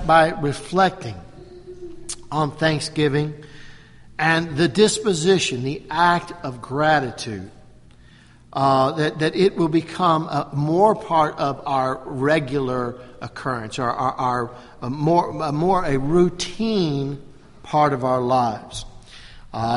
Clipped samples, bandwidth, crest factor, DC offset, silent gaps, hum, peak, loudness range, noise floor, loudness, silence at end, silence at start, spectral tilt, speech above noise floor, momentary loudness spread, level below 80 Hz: under 0.1%; 11.5 kHz; 18 dB; under 0.1%; none; none; -2 dBFS; 4 LU; -48 dBFS; -21 LUFS; 0 s; 0 s; -5.5 dB/octave; 28 dB; 16 LU; -46 dBFS